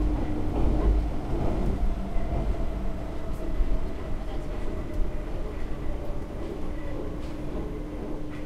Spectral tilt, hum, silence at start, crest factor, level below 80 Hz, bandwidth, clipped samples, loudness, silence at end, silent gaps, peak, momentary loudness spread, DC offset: -8 dB/octave; none; 0 s; 16 dB; -28 dBFS; 8.8 kHz; under 0.1%; -33 LUFS; 0 s; none; -12 dBFS; 8 LU; under 0.1%